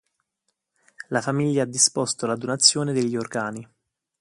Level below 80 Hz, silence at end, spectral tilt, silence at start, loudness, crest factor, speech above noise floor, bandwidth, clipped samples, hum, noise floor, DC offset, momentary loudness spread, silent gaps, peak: -68 dBFS; 0.55 s; -3 dB/octave; 1 s; -22 LUFS; 24 dB; 54 dB; 11.5 kHz; under 0.1%; none; -77 dBFS; under 0.1%; 11 LU; none; -2 dBFS